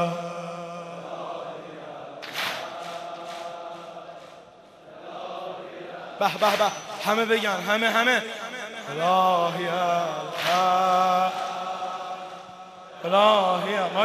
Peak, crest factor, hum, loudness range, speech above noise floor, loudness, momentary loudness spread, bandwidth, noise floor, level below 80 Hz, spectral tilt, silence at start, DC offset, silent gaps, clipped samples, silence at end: -6 dBFS; 20 dB; none; 12 LU; 27 dB; -24 LUFS; 19 LU; 14.5 kHz; -49 dBFS; -76 dBFS; -3.5 dB/octave; 0 s; under 0.1%; none; under 0.1%; 0 s